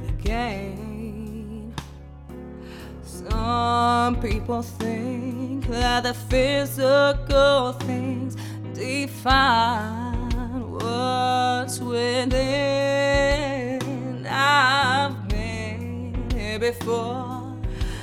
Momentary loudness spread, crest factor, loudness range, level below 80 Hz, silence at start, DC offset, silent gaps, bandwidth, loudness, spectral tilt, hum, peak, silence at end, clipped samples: 16 LU; 18 dB; 5 LU; -34 dBFS; 0 s; under 0.1%; none; 17.5 kHz; -23 LUFS; -5 dB/octave; none; -4 dBFS; 0 s; under 0.1%